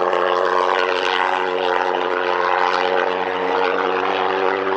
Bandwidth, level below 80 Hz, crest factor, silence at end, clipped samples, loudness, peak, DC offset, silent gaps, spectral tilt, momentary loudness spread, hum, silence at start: 8.6 kHz; -70 dBFS; 18 dB; 0 s; under 0.1%; -19 LUFS; 0 dBFS; under 0.1%; none; -3.5 dB/octave; 2 LU; none; 0 s